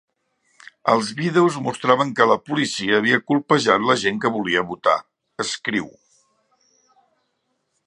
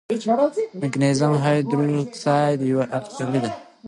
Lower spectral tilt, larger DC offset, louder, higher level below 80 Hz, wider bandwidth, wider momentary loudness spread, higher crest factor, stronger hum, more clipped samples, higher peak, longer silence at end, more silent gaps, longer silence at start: second, -4.5 dB/octave vs -6.5 dB/octave; neither; about the same, -20 LUFS vs -21 LUFS; about the same, -64 dBFS vs -66 dBFS; about the same, 11 kHz vs 11 kHz; about the same, 9 LU vs 7 LU; first, 22 dB vs 14 dB; neither; neither; first, 0 dBFS vs -8 dBFS; first, 1.95 s vs 0 s; neither; first, 0.85 s vs 0.1 s